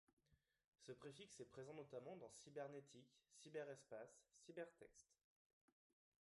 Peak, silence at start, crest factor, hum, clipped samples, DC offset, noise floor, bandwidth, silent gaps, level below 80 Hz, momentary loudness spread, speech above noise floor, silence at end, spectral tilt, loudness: -42 dBFS; 0.3 s; 20 dB; none; under 0.1%; under 0.1%; -85 dBFS; 11.5 kHz; 0.67-0.72 s; under -90 dBFS; 12 LU; 26 dB; 1.2 s; -4.5 dB/octave; -59 LUFS